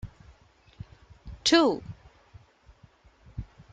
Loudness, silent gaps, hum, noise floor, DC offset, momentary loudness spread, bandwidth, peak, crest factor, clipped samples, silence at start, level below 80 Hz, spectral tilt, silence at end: -24 LUFS; none; none; -58 dBFS; under 0.1%; 27 LU; 9 kHz; -8 dBFS; 24 dB; under 0.1%; 0.05 s; -52 dBFS; -3.5 dB/octave; 0.3 s